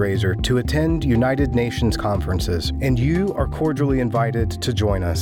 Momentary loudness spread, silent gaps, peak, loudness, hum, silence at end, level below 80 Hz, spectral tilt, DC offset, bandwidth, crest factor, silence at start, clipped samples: 4 LU; none; -6 dBFS; -20 LUFS; none; 0 s; -30 dBFS; -6.5 dB/octave; under 0.1%; 17.5 kHz; 12 dB; 0 s; under 0.1%